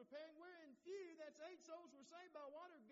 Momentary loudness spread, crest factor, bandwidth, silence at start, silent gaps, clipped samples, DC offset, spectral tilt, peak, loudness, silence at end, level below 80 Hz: 7 LU; 14 dB; 7.4 kHz; 0 s; none; under 0.1%; under 0.1%; -1.5 dB/octave; -44 dBFS; -59 LUFS; 0 s; under -90 dBFS